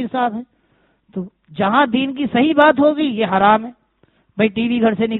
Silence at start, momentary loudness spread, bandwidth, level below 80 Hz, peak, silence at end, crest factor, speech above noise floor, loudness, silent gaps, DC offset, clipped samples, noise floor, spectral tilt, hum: 0 s; 19 LU; 4.1 kHz; -56 dBFS; 0 dBFS; 0 s; 18 dB; 44 dB; -16 LUFS; none; under 0.1%; under 0.1%; -60 dBFS; -3.5 dB/octave; none